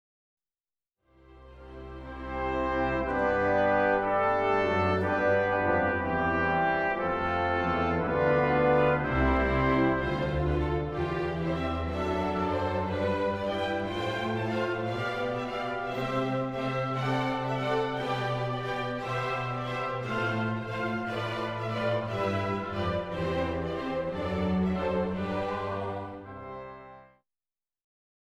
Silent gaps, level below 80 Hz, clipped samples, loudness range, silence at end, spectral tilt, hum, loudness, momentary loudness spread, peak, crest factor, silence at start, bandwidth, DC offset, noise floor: none; -44 dBFS; under 0.1%; 5 LU; 1.15 s; -7 dB/octave; none; -29 LUFS; 7 LU; -12 dBFS; 16 dB; 1.3 s; 12 kHz; under 0.1%; under -90 dBFS